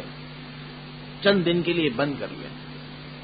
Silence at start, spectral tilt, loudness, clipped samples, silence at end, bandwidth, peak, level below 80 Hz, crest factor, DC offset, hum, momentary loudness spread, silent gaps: 0 s; -10.5 dB/octave; -24 LUFS; under 0.1%; 0 s; 5 kHz; -6 dBFS; -54 dBFS; 20 dB; under 0.1%; none; 18 LU; none